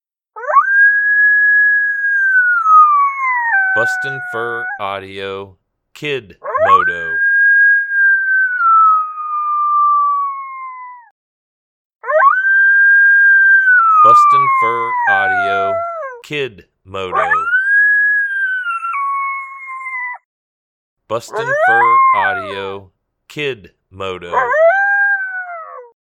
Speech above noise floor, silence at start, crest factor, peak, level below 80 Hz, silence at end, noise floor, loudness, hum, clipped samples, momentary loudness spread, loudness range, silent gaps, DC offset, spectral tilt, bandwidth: over 75 dB; 0.35 s; 14 dB; 0 dBFS; -62 dBFS; 0.25 s; under -90 dBFS; -12 LUFS; none; under 0.1%; 18 LU; 9 LU; 11.11-11.90 s, 20.25-20.96 s; under 0.1%; -3.5 dB/octave; 10.5 kHz